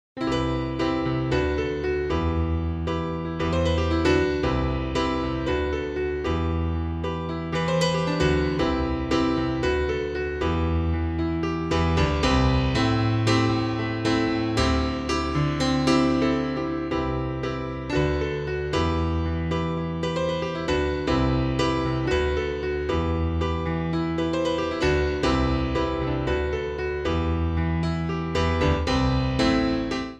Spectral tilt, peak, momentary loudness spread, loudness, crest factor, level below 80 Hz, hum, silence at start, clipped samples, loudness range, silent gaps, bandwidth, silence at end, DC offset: -6.5 dB/octave; -8 dBFS; 6 LU; -25 LUFS; 16 dB; -32 dBFS; none; 0.15 s; under 0.1%; 3 LU; none; 10 kHz; 0 s; under 0.1%